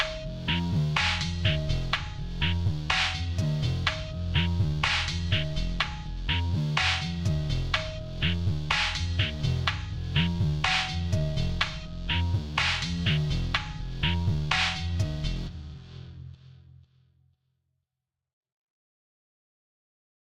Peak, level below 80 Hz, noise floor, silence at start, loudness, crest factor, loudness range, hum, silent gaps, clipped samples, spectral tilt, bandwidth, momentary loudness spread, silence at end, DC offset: -6 dBFS; -38 dBFS; -87 dBFS; 0 s; -28 LUFS; 22 dB; 3 LU; none; 18.33-18.41 s, 18.52-18.68 s; under 0.1%; -4.5 dB/octave; 11 kHz; 9 LU; 1.6 s; under 0.1%